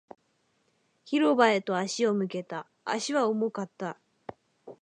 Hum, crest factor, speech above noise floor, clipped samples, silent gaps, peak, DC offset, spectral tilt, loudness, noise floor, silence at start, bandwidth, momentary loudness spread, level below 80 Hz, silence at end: none; 22 dB; 45 dB; under 0.1%; none; -6 dBFS; under 0.1%; -4.5 dB/octave; -28 LUFS; -72 dBFS; 1.05 s; 10.5 kHz; 20 LU; -80 dBFS; 0.1 s